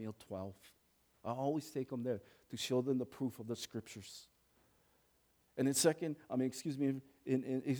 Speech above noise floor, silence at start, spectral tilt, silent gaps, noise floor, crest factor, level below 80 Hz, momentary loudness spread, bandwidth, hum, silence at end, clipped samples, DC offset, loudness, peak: 36 dB; 0 s; -5 dB/octave; none; -75 dBFS; 22 dB; -80 dBFS; 16 LU; over 20 kHz; none; 0 s; under 0.1%; under 0.1%; -39 LUFS; -18 dBFS